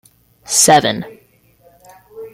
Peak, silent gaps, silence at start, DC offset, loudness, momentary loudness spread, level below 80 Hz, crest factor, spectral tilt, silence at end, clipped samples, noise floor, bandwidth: 0 dBFS; none; 0.5 s; under 0.1%; -12 LUFS; 24 LU; -56 dBFS; 18 dB; -2 dB/octave; 0.05 s; under 0.1%; -52 dBFS; 16.5 kHz